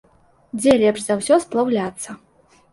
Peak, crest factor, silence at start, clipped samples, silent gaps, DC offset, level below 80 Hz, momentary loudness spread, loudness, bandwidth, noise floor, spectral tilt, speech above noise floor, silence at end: -2 dBFS; 18 dB; 0.55 s; under 0.1%; none; under 0.1%; -56 dBFS; 17 LU; -18 LUFS; 11.5 kHz; -47 dBFS; -4.5 dB/octave; 29 dB; 0.55 s